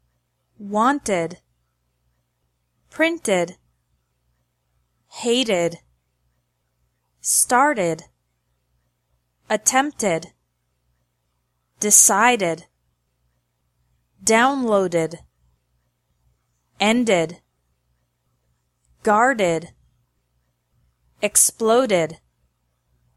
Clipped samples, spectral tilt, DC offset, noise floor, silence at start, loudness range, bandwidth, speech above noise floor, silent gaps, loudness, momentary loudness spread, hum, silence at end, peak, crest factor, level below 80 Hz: under 0.1%; -2.5 dB/octave; under 0.1%; -72 dBFS; 0.6 s; 8 LU; 15.5 kHz; 53 dB; none; -19 LUFS; 13 LU; 60 Hz at -60 dBFS; 1 s; 0 dBFS; 24 dB; -62 dBFS